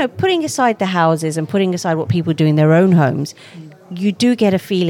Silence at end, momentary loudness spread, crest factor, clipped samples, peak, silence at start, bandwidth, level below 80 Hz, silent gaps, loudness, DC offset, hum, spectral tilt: 0 s; 9 LU; 14 dB; under 0.1%; -2 dBFS; 0 s; 16 kHz; -64 dBFS; none; -15 LUFS; under 0.1%; none; -6.5 dB/octave